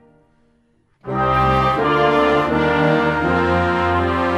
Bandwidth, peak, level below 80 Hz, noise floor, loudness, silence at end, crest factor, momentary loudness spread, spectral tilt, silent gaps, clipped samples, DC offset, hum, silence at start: 12.5 kHz; -2 dBFS; -36 dBFS; -60 dBFS; -17 LUFS; 0 s; 16 dB; 3 LU; -7 dB/octave; none; under 0.1%; under 0.1%; none; 1.05 s